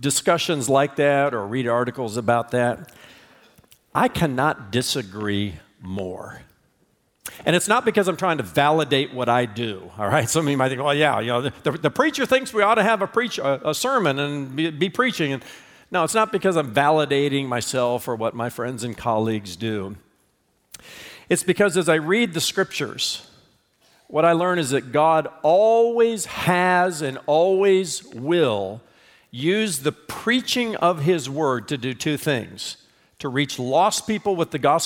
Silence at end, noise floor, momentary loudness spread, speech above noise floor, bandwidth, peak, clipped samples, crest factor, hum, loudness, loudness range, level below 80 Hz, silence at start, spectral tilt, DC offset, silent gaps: 0 s; -66 dBFS; 10 LU; 45 dB; 18 kHz; -4 dBFS; under 0.1%; 18 dB; none; -21 LUFS; 6 LU; -58 dBFS; 0 s; -4.5 dB/octave; under 0.1%; none